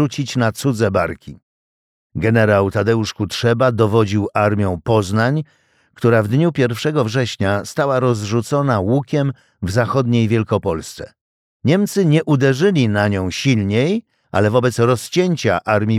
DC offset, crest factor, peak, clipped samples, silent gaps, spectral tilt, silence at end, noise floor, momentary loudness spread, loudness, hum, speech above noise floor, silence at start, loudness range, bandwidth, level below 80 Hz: under 0.1%; 14 dB; -2 dBFS; under 0.1%; 1.42-2.10 s, 11.21-11.60 s; -6.5 dB/octave; 0 s; under -90 dBFS; 8 LU; -17 LUFS; none; over 74 dB; 0 s; 2 LU; 15 kHz; -50 dBFS